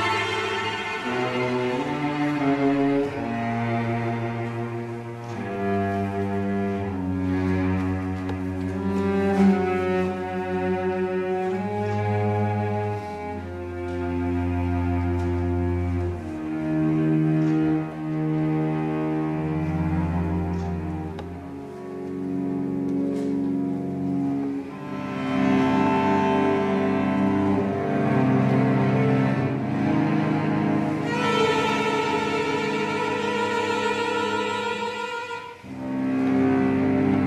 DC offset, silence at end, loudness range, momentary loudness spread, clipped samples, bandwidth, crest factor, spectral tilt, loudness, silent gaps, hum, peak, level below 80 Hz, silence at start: under 0.1%; 0 s; 5 LU; 10 LU; under 0.1%; 12 kHz; 14 dB; -7 dB/octave; -24 LUFS; none; none; -8 dBFS; -48 dBFS; 0 s